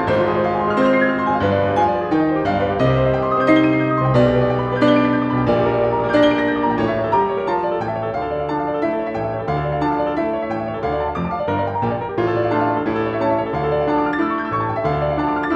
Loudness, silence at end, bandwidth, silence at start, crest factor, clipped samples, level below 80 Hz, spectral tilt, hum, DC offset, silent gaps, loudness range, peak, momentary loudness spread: -18 LUFS; 0 s; 8 kHz; 0 s; 16 dB; under 0.1%; -40 dBFS; -8.5 dB/octave; none; under 0.1%; none; 5 LU; -2 dBFS; 7 LU